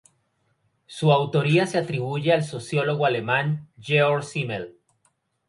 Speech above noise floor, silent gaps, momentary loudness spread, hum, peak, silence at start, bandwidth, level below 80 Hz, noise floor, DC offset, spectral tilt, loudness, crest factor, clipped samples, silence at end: 47 dB; none; 10 LU; none; -6 dBFS; 0.9 s; 11.5 kHz; -66 dBFS; -70 dBFS; under 0.1%; -6 dB/octave; -23 LUFS; 18 dB; under 0.1%; 0.8 s